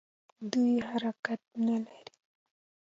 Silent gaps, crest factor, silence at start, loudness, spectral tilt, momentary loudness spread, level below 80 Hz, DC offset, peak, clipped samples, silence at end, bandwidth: 1.19-1.23 s; 20 dB; 0.4 s; -32 LUFS; -5.5 dB/octave; 11 LU; -78 dBFS; under 0.1%; -14 dBFS; under 0.1%; 1 s; 7.6 kHz